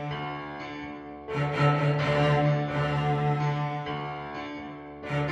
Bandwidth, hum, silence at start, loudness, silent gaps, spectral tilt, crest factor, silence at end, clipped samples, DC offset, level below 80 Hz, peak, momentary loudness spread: 8 kHz; none; 0 s; -28 LUFS; none; -7.5 dB/octave; 18 dB; 0 s; under 0.1%; under 0.1%; -52 dBFS; -10 dBFS; 15 LU